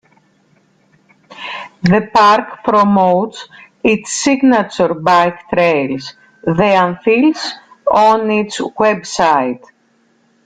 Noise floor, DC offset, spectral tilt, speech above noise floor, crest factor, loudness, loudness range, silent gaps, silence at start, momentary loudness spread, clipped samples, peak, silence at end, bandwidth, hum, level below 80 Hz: -56 dBFS; under 0.1%; -5 dB/octave; 43 dB; 14 dB; -13 LUFS; 2 LU; none; 1.3 s; 13 LU; under 0.1%; 0 dBFS; 0.9 s; 9.6 kHz; none; -52 dBFS